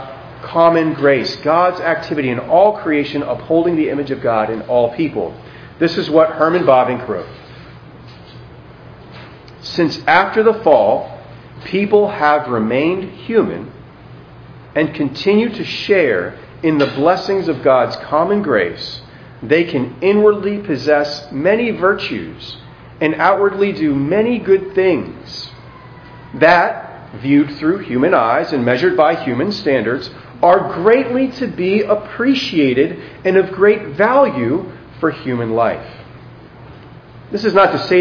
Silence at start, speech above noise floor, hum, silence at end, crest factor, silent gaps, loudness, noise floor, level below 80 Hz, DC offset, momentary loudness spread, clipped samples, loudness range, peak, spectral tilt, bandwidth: 0 s; 23 dB; none; 0 s; 16 dB; none; -15 LUFS; -38 dBFS; -50 dBFS; under 0.1%; 14 LU; under 0.1%; 4 LU; 0 dBFS; -7 dB/octave; 5.4 kHz